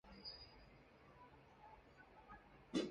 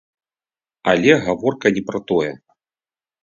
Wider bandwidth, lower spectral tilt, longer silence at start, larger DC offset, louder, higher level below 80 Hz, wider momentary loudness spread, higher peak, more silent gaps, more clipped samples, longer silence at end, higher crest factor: first, 9.6 kHz vs 7.6 kHz; about the same, -5 dB/octave vs -5.5 dB/octave; second, 0.05 s vs 0.85 s; neither; second, -55 LUFS vs -18 LUFS; second, -72 dBFS vs -56 dBFS; first, 17 LU vs 10 LU; second, -28 dBFS vs 0 dBFS; neither; neither; second, 0 s vs 0.85 s; first, 26 dB vs 20 dB